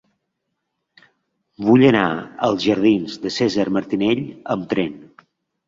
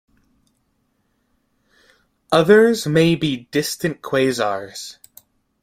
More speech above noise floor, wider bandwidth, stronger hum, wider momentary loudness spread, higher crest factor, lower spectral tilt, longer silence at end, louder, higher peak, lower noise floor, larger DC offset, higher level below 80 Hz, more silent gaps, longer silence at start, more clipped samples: first, 58 dB vs 50 dB; second, 7.6 kHz vs 16 kHz; neither; second, 11 LU vs 16 LU; about the same, 18 dB vs 20 dB; first, -6.5 dB/octave vs -5 dB/octave; about the same, 0.65 s vs 0.7 s; about the same, -19 LUFS vs -18 LUFS; about the same, -2 dBFS vs -2 dBFS; first, -76 dBFS vs -67 dBFS; neither; about the same, -56 dBFS vs -58 dBFS; neither; second, 1.6 s vs 2.3 s; neither